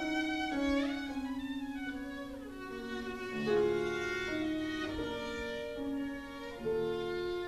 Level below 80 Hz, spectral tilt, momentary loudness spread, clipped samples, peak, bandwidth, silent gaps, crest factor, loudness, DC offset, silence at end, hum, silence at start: -56 dBFS; -5 dB/octave; 10 LU; under 0.1%; -20 dBFS; 14 kHz; none; 16 dB; -36 LUFS; under 0.1%; 0 s; none; 0 s